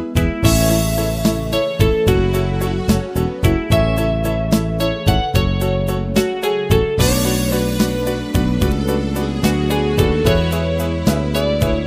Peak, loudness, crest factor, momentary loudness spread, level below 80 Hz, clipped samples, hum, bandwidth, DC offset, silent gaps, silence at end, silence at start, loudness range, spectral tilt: 0 dBFS; -17 LUFS; 16 dB; 4 LU; -26 dBFS; under 0.1%; none; 15.5 kHz; under 0.1%; none; 0 s; 0 s; 1 LU; -5.5 dB/octave